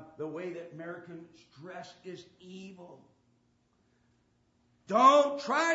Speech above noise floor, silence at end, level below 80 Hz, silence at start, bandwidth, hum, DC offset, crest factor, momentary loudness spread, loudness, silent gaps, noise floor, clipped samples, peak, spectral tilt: 41 dB; 0 s; -82 dBFS; 0 s; 8 kHz; none; under 0.1%; 22 dB; 27 LU; -26 LUFS; none; -71 dBFS; under 0.1%; -10 dBFS; -4 dB/octave